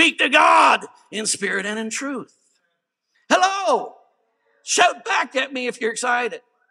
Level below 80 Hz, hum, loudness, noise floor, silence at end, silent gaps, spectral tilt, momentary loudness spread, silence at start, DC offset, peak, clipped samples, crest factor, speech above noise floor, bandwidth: -86 dBFS; none; -19 LUFS; -74 dBFS; 0.35 s; none; -1 dB/octave; 16 LU; 0 s; under 0.1%; 0 dBFS; under 0.1%; 20 dB; 54 dB; 14.5 kHz